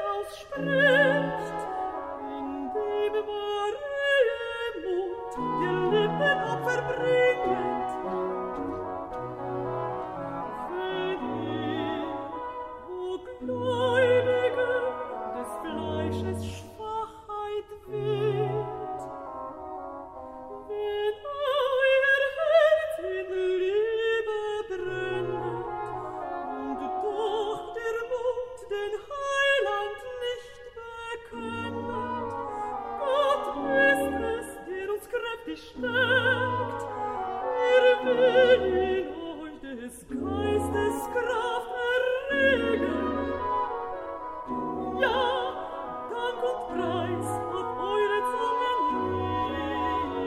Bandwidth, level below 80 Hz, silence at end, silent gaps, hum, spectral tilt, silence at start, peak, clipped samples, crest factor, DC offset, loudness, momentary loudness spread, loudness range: 14.5 kHz; -56 dBFS; 0 s; none; none; -5.5 dB/octave; 0 s; -8 dBFS; under 0.1%; 20 dB; under 0.1%; -28 LUFS; 14 LU; 8 LU